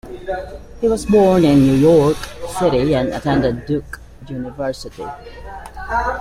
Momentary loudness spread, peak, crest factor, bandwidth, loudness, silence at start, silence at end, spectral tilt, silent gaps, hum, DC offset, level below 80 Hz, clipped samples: 22 LU; -2 dBFS; 16 dB; 15.5 kHz; -16 LUFS; 0.05 s; 0 s; -7 dB/octave; none; none; under 0.1%; -36 dBFS; under 0.1%